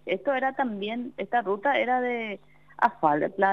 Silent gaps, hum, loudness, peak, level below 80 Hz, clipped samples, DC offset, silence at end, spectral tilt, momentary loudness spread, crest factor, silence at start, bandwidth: none; none; -27 LUFS; -8 dBFS; -70 dBFS; under 0.1%; 0.1%; 0 s; -7 dB/octave; 9 LU; 20 dB; 0.05 s; 6.6 kHz